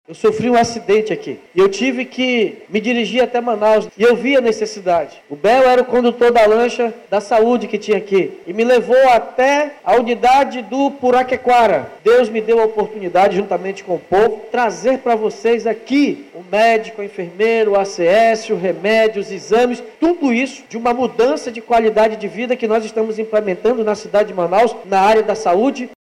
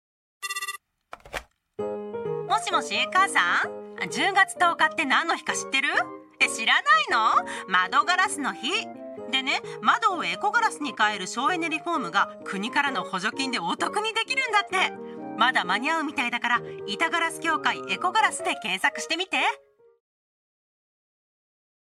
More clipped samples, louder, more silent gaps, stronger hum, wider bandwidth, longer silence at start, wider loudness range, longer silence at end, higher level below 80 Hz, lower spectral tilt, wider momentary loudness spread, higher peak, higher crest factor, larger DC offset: neither; first, -15 LUFS vs -24 LUFS; neither; neither; second, 12.5 kHz vs 15.5 kHz; second, 0.1 s vs 0.4 s; about the same, 3 LU vs 4 LU; second, 0.1 s vs 2.4 s; first, -52 dBFS vs -68 dBFS; first, -5 dB/octave vs -2 dB/octave; second, 8 LU vs 12 LU; about the same, -6 dBFS vs -6 dBFS; second, 10 dB vs 20 dB; neither